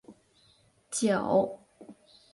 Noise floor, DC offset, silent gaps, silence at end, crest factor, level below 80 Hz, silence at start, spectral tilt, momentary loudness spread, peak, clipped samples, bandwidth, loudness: -65 dBFS; under 0.1%; none; 0.4 s; 20 dB; -68 dBFS; 0.1 s; -4.5 dB/octave; 12 LU; -12 dBFS; under 0.1%; 11.5 kHz; -28 LUFS